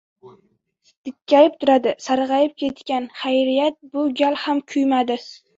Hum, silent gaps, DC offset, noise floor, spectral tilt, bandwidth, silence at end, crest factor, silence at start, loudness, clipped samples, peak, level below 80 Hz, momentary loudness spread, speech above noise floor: none; 0.97-1.04 s; under 0.1%; -63 dBFS; -4 dB/octave; 7.8 kHz; 0.25 s; 18 dB; 0.25 s; -19 LUFS; under 0.1%; -2 dBFS; -66 dBFS; 11 LU; 44 dB